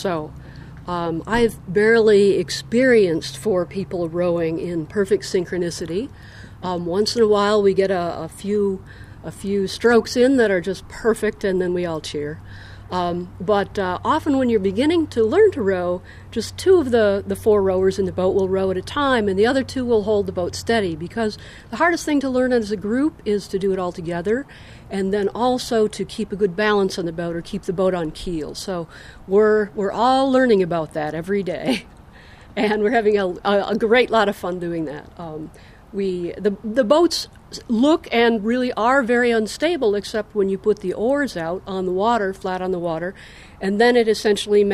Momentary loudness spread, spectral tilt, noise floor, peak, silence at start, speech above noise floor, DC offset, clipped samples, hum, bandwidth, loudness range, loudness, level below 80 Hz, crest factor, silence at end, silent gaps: 12 LU; -5.5 dB/octave; -44 dBFS; -2 dBFS; 0 s; 24 dB; under 0.1%; under 0.1%; none; 14.5 kHz; 4 LU; -20 LUFS; -46 dBFS; 18 dB; 0 s; none